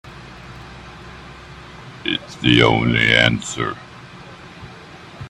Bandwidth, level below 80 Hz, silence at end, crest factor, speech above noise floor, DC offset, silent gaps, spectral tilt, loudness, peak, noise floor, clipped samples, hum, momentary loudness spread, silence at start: 11.5 kHz; -42 dBFS; 0 s; 22 dB; 23 dB; under 0.1%; none; -4.5 dB/octave; -16 LUFS; 0 dBFS; -39 dBFS; under 0.1%; none; 25 LU; 0.05 s